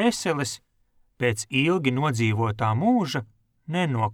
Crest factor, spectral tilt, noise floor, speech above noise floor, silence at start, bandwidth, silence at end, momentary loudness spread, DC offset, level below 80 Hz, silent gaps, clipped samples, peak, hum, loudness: 16 dB; -5.5 dB/octave; -64 dBFS; 40 dB; 0 s; 16 kHz; 0 s; 8 LU; under 0.1%; -60 dBFS; none; under 0.1%; -8 dBFS; none; -24 LUFS